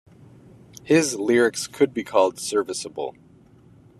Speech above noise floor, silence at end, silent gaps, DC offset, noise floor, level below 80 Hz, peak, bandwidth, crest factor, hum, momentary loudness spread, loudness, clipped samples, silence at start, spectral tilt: 30 dB; 0.9 s; none; under 0.1%; -52 dBFS; -66 dBFS; -4 dBFS; 13.5 kHz; 20 dB; none; 11 LU; -22 LUFS; under 0.1%; 0.85 s; -4 dB/octave